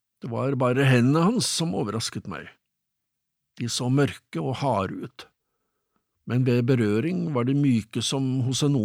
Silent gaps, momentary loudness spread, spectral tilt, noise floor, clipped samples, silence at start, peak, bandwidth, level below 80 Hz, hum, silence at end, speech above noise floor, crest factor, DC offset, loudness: none; 13 LU; -5.5 dB/octave; -81 dBFS; under 0.1%; 0.25 s; -8 dBFS; 15 kHz; -64 dBFS; none; 0 s; 57 dB; 16 dB; under 0.1%; -24 LUFS